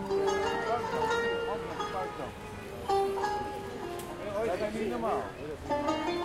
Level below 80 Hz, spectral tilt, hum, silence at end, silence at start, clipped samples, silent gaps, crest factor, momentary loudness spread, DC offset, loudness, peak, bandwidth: -54 dBFS; -5 dB/octave; none; 0 s; 0 s; under 0.1%; none; 16 dB; 10 LU; under 0.1%; -33 LUFS; -16 dBFS; 16 kHz